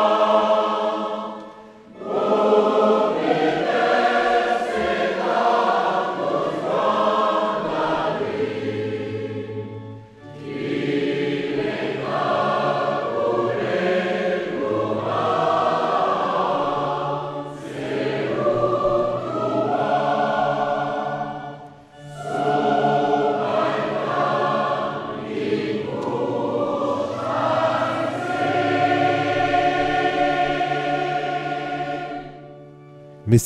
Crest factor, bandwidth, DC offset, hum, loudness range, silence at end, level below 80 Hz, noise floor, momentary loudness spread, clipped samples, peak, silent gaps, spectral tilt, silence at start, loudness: 18 dB; 14.5 kHz; under 0.1%; none; 4 LU; 0 s; -54 dBFS; -43 dBFS; 11 LU; under 0.1%; -4 dBFS; none; -6 dB/octave; 0 s; -22 LUFS